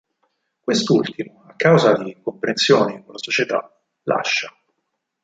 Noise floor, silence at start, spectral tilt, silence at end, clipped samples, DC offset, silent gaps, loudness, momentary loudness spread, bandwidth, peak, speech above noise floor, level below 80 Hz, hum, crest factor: -76 dBFS; 0.65 s; -4.5 dB/octave; 0.75 s; under 0.1%; under 0.1%; none; -19 LUFS; 17 LU; 9.2 kHz; -2 dBFS; 57 dB; -62 dBFS; none; 18 dB